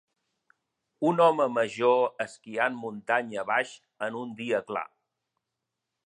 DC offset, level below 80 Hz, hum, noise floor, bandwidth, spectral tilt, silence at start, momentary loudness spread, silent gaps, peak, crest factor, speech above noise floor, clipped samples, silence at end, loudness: under 0.1%; -80 dBFS; none; -85 dBFS; 10 kHz; -5.5 dB/octave; 1 s; 13 LU; none; -10 dBFS; 20 dB; 58 dB; under 0.1%; 1.2 s; -28 LUFS